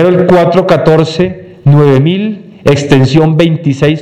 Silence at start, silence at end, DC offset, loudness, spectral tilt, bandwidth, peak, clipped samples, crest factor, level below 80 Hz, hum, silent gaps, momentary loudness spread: 0 s; 0 s; under 0.1%; -8 LUFS; -7.5 dB/octave; 9.6 kHz; 0 dBFS; 2%; 8 dB; -38 dBFS; none; none; 8 LU